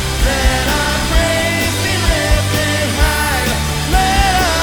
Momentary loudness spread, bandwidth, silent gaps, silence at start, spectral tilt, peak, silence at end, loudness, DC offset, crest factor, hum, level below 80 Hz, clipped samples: 3 LU; over 20 kHz; none; 0 s; -3.5 dB/octave; 0 dBFS; 0 s; -14 LUFS; 1%; 14 dB; none; -18 dBFS; under 0.1%